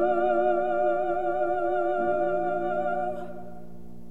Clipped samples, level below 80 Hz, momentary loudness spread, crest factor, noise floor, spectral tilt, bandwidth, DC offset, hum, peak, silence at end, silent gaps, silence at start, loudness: under 0.1%; -56 dBFS; 18 LU; 14 dB; -46 dBFS; -8 dB/octave; 7.6 kHz; 2%; none; -12 dBFS; 0 s; none; 0 s; -26 LUFS